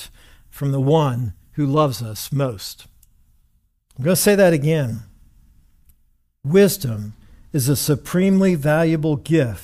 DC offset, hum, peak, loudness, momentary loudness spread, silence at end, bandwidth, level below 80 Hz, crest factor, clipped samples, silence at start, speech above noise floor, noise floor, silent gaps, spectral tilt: under 0.1%; none; -4 dBFS; -19 LUFS; 14 LU; 0 s; 16 kHz; -48 dBFS; 16 dB; under 0.1%; 0 s; 43 dB; -61 dBFS; none; -6 dB/octave